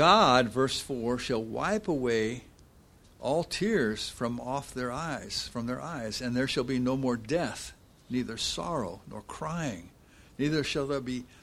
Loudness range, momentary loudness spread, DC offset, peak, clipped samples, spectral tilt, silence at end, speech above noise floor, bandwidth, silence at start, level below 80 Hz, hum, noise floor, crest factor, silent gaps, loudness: 3 LU; 10 LU; under 0.1%; -6 dBFS; under 0.1%; -4.5 dB/octave; 0.15 s; 28 dB; 14.5 kHz; 0 s; -54 dBFS; none; -57 dBFS; 24 dB; none; -30 LUFS